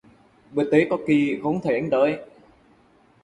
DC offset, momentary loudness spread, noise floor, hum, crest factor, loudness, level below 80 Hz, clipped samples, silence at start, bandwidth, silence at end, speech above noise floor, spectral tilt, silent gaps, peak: under 0.1%; 7 LU; -57 dBFS; none; 20 dB; -22 LUFS; -62 dBFS; under 0.1%; 0.5 s; 8.8 kHz; 1 s; 36 dB; -7.5 dB/octave; none; -4 dBFS